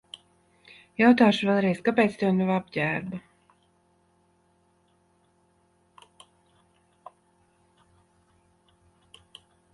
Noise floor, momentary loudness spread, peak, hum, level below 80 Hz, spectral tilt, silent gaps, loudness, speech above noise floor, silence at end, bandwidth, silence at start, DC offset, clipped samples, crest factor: -66 dBFS; 22 LU; -6 dBFS; none; -68 dBFS; -7 dB/octave; none; -23 LUFS; 44 dB; 6.55 s; 11.5 kHz; 1 s; under 0.1%; under 0.1%; 22 dB